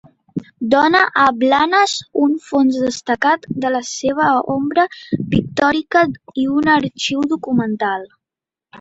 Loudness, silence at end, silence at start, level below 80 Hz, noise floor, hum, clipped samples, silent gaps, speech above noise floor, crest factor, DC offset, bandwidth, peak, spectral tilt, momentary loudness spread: -16 LUFS; 0 s; 0.35 s; -50 dBFS; -87 dBFS; none; under 0.1%; none; 71 dB; 16 dB; under 0.1%; 8 kHz; -2 dBFS; -4.5 dB/octave; 8 LU